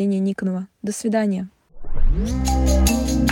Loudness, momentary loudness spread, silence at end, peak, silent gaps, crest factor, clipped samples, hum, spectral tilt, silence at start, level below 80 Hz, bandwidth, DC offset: -22 LUFS; 11 LU; 0 s; -6 dBFS; none; 14 dB; under 0.1%; none; -5.5 dB/octave; 0 s; -22 dBFS; 17 kHz; under 0.1%